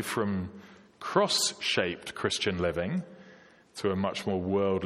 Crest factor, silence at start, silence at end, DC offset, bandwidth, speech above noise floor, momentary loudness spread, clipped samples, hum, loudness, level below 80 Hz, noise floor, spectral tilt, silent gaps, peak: 22 dB; 0 s; 0 s; under 0.1%; 15.5 kHz; 26 dB; 11 LU; under 0.1%; none; -29 LUFS; -60 dBFS; -55 dBFS; -4 dB/octave; none; -10 dBFS